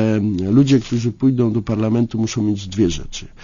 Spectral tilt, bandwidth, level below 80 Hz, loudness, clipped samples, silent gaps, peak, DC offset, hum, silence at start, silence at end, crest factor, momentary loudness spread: -7 dB/octave; 7.4 kHz; -38 dBFS; -18 LUFS; under 0.1%; none; -4 dBFS; under 0.1%; none; 0 s; 0 s; 14 dB; 6 LU